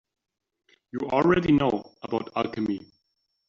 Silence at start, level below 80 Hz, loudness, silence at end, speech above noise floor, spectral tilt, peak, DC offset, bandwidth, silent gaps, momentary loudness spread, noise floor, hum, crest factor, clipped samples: 0.95 s; -54 dBFS; -26 LUFS; 0.65 s; 52 dB; -5.5 dB/octave; -8 dBFS; under 0.1%; 7.2 kHz; none; 13 LU; -76 dBFS; none; 20 dB; under 0.1%